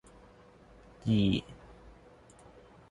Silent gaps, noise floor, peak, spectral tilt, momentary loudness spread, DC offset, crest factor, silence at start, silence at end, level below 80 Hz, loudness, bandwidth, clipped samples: none; -57 dBFS; -16 dBFS; -7.5 dB/octave; 27 LU; under 0.1%; 18 dB; 1.05 s; 1.35 s; -54 dBFS; -31 LUFS; 11 kHz; under 0.1%